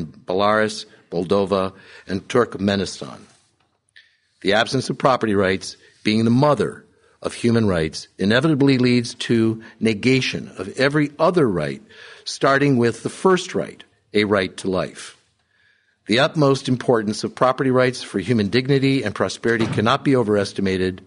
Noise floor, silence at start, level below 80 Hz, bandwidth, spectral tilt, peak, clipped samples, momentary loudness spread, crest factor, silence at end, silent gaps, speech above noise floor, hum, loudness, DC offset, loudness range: -65 dBFS; 0 s; -54 dBFS; 11 kHz; -5.5 dB/octave; -2 dBFS; under 0.1%; 12 LU; 18 dB; 0.1 s; none; 46 dB; none; -20 LUFS; under 0.1%; 4 LU